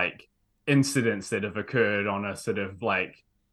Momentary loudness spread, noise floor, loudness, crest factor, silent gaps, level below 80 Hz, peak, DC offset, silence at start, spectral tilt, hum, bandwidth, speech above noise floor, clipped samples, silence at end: 7 LU; -59 dBFS; -27 LUFS; 20 dB; none; -68 dBFS; -8 dBFS; under 0.1%; 0 s; -5 dB/octave; none; 12.5 kHz; 32 dB; under 0.1%; 0.4 s